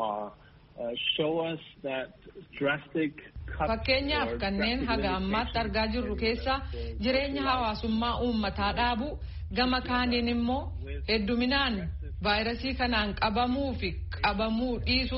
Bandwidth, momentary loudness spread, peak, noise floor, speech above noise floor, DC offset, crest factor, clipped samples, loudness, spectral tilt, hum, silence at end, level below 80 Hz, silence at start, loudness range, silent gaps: 5.8 kHz; 10 LU; -12 dBFS; -53 dBFS; 23 dB; under 0.1%; 18 dB; under 0.1%; -29 LUFS; -3 dB/octave; none; 0 s; -40 dBFS; 0 s; 3 LU; none